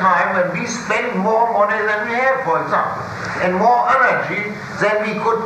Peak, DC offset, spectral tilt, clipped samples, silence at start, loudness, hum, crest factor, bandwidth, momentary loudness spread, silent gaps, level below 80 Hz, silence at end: -2 dBFS; under 0.1%; -5 dB/octave; under 0.1%; 0 s; -17 LUFS; none; 14 dB; 14.5 kHz; 8 LU; none; -54 dBFS; 0 s